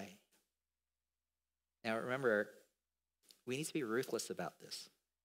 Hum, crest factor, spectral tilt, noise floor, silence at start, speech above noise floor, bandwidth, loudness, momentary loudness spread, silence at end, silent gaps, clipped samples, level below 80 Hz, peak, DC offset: 60 Hz at -75 dBFS; 22 dB; -4 dB/octave; under -90 dBFS; 0 s; over 50 dB; 16 kHz; -41 LUFS; 14 LU; 0.35 s; none; under 0.1%; under -90 dBFS; -22 dBFS; under 0.1%